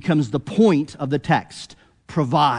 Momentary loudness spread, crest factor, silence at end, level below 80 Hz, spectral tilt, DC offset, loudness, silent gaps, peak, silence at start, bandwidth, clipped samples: 20 LU; 16 dB; 0 s; -54 dBFS; -7 dB/octave; under 0.1%; -20 LUFS; none; -4 dBFS; 0.05 s; 10.5 kHz; under 0.1%